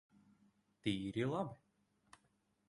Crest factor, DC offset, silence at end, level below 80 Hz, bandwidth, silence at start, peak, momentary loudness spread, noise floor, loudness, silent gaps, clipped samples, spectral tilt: 20 dB; under 0.1%; 1.1 s; -72 dBFS; 11 kHz; 0.85 s; -24 dBFS; 8 LU; -79 dBFS; -41 LUFS; none; under 0.1%; -6.5 dB/octave